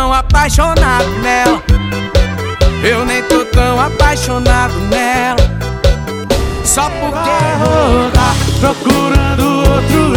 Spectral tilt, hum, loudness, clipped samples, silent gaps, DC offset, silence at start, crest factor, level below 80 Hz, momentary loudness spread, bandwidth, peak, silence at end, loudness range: -5 dB/octave; none; -12 LUFS; under 0.1%; none; under 0.1%; 0 s; 10 dB; -16 dBFS; 4 LU; 19 kHz; 0 dBFS; 0 s; 1 LU